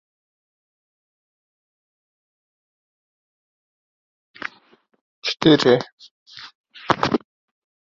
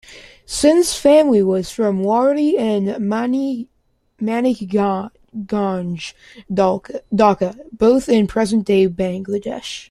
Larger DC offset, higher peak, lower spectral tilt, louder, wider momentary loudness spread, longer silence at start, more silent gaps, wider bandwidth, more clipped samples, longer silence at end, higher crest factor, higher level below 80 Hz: neither; about the same, 0 dBFS vs 0 dBFS; about the same, -5.5 dB/octave vs -5.5 dB/octave; about the same, -19 LUFS vs -17 LUFS; first, 25 LU vs 13 LU; first, 5.25 s vs 0.1 s; first, 5.92-5.98 s, 6.11-6.26 s, 6.55-6.64 s vs none; second, 7.6 kHz vs 14 kHz; neither; first, 0.75 s vs 0.05 s; first, 26 dB vs 16 dB; second, -60 dBFS vs -48 dBFS